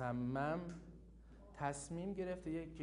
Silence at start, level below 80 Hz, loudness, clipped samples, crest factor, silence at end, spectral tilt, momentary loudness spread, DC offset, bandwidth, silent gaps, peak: 0 s; -62 dBFS; -43 LUFS; under 0.1%; 18 dB; 0 s; -6.5 dB/octave; 21 LU; under 0.1%; 10.5 kHz; none; -26 dBFS